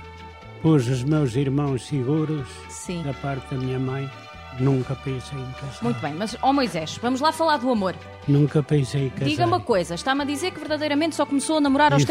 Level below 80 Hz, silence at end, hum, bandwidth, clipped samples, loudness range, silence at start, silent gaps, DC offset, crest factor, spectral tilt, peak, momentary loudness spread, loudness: -50 dBFS; 0 s; none; 14 kHz; under 0.1%; 5 LU; 0 s; none; under 0.1%; 16 dB; -6 dB/octave; -6 dBFS; 12 LU; -23 LUFS